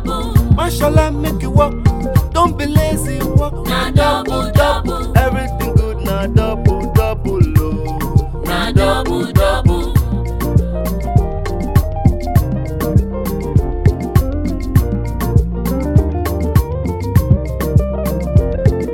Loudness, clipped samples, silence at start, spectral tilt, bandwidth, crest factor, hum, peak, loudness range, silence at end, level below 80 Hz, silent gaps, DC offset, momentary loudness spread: -16 LUFS; under 0.1%; 0 s; -7 dB/octave; 17.5 kHz; 14 dB; none; 0 dBFS; 2 LU; 0 s; -20 dBFS; none; 1%; 6 LU